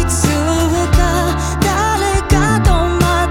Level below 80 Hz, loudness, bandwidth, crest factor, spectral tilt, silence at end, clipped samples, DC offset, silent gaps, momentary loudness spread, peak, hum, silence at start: -20 dBFS; -14 LUFS; 17.5 kHz; 14 dB; -5 dB/octave; 0 s; under 0.1%; under 0.1%; none; 3 LU; 0 dBFS; none; 0 s